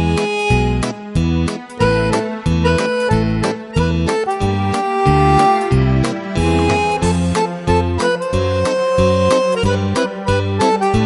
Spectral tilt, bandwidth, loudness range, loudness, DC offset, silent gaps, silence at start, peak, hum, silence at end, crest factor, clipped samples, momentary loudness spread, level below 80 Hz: -6 dB/octave; 11.5 kHz; 2 LU; -16 LUFS; under 0.1%; none; 0 s; 0 dBFS; none; 0 s; 16 dB; under 0.1%; 5 LU; -28 dBFS